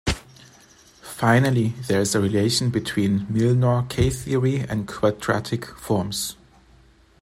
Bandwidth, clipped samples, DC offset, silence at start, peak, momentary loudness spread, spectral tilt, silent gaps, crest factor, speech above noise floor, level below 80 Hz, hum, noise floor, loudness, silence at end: 15.5 kHz; under 0.1%; under 0.1%; 0.05 s; -4 dBFS; 9 LU; -5.5 dB/octave; none; 20 dB; 33 dB; -42 dBFS; none; -54 dBFS; -22 LUFS; 0.9 s